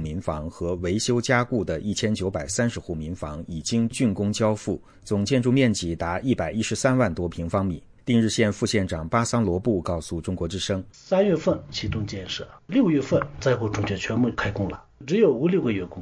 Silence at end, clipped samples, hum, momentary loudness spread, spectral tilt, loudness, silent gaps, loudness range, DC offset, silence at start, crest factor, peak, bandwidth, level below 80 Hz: 0 s; under 0.1%; none; 10 LU; -5.5 dB/octave; -25 LUFS; none; 2 LU; under 0.1%; 0 s; 18 dB; -6 dBFS; 10.5 kHz; -46 dBFS